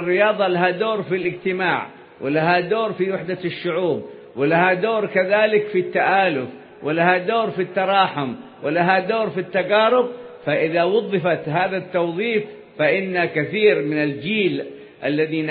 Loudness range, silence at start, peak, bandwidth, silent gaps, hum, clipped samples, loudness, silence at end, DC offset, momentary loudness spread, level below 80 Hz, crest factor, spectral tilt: 2 LU; 0 s; -2 dBFS; 4.9 kHz; none; none; under 0.1%; -20 LUFS; 0 s; under 0.1%; 10 LU; -68 dBFS; 18 dB; -10.5 dB/octave